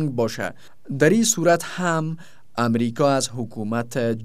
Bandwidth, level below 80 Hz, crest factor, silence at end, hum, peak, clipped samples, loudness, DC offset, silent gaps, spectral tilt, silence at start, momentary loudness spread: 16 kHz; -66 dBFS; 18 dB; 0 s; none; -4 dBFS; under 0.1%; -22 LUFS; 1%; none; -4.5 dB/octave; 0 s; 13 LU